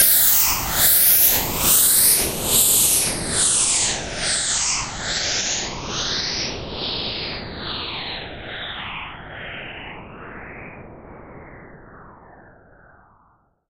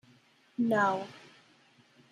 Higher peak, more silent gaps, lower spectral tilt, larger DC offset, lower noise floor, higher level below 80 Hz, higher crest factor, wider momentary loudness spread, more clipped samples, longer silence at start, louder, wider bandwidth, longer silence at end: first, -2 dBFS vs -14 dBFS; neither; second, -0.5 dB/octave vs -6 dB/octave; neither; about the same, -60 dBFS vs -63 dBFS; first, -42 dBFS vs -80 dBFS; about the same, 20 dB vs 20 dB; about the same, 22 LU vs 20 LU; neither; second, 0 s vs 0.6 s; first, -17 LUFS vs -30 LUFS; first, 16.5 kHz vs 12.5 kHz; first, 1.3 s vs 0.95 s